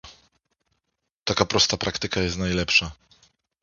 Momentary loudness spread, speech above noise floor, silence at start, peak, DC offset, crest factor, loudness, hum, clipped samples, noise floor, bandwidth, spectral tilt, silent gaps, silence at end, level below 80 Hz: 8 LU; 55 dB; 0.05 s; 0 dBFS; under 0.1%; 26 dB; -22 LUFS; none; under 0.1%; -79 dBFS; 7.4 kHz; -3 dB/octave; 1.12-1.26 s; 0.7 s; -44 dBFS